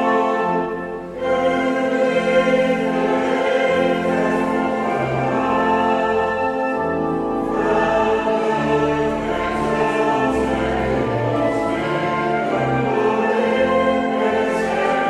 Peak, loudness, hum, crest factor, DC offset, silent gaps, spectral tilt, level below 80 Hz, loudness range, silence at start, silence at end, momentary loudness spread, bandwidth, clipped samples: -4 dBFS; -19 LUFS; none; 14 dB; under 0.1%; none; -6.5 dB/octave; -42 dBFS; 1 LU; 0 s; 0 s; 4 LU; 12 kHz; under 0.1%